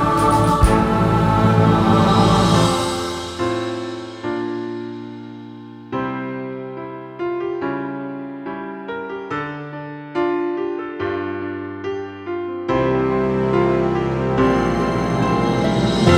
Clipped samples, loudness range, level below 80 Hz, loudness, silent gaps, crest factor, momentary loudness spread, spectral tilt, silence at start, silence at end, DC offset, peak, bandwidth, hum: under 0.1%; 11 LU; -34 dBFS; -20 LUFS; none; 18 dB; 15 LU; -6.5 dB/octave; 0 s; 0 s; under 0.1%; 0 dBFS; 16 kHz; none